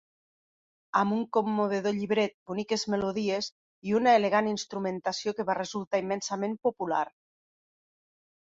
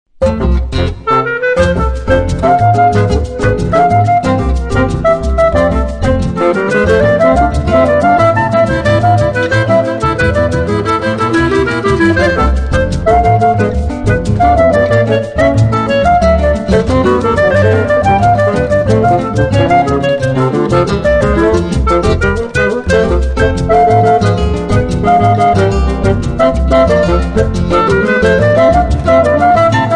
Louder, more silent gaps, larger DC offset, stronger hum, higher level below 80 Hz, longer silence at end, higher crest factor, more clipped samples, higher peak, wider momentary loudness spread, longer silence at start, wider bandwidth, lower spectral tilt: second, -29 LUFS vs -11 LUFS; first, 2.34-2.46 s, 3.52-3.82 s, 5.87-5.91 s vs none; neither; neither; second, -70 dBFS vs -20 dBFS; first, 1.4 s vs 0 s; first, 22 dB vs 10 dB; neither; second, -8 dBFS vs 0 dBFS; first, 8 LU vs 5 LU; first, 0.95 s vs 0.2 s; second, 7.8 kHz vs 10 kHz; second, -4.5 dB/octave vs -7 dB/octave